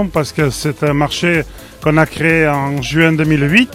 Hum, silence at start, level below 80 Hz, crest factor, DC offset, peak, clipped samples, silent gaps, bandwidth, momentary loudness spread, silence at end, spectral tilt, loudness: none; 0 s; -36 dBFS; 14 dB; under 0.1%; 0 dBFS; under 0.1%; none; 16 kHz; 6 LU; 0 s; -5.5 dB/octave; -14 LUFS